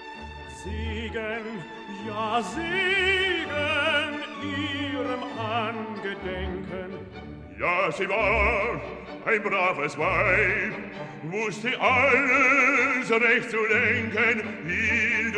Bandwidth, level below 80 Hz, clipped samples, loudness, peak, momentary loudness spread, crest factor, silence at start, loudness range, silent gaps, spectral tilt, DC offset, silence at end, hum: 11 kHz; -44 dBFS; under 0.1%; -24 LUFS; -8 dBFS; 17 LU; 18 dB; 0 s; 8 LU; none; -4.5 dB/octave; under 0.1%; 0 s; none